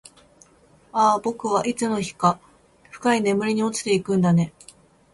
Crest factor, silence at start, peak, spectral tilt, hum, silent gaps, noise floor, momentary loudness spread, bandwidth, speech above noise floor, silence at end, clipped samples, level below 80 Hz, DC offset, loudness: 18 dB; 0.95 s; -6 dBFS; -5.5 dB/octave; none; none; -55 dBFS; 6 LU; 11.5 kHz; 34 dB; 0.65 s; under 0.1%; -60 dBFS; under 0.1%; -22 LUFS